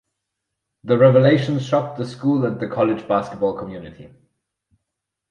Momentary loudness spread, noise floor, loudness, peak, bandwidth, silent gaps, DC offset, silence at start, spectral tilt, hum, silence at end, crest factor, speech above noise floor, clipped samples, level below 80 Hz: 19 LU; -81 dBFS; -19 LUFS; -2 dBFS; 9 kHz; none; under 0.1%; 0.85 s; -8 dB/octave; none; 1.25 s; 18 dB; 62 dB; under 0.1%; -58 dBFS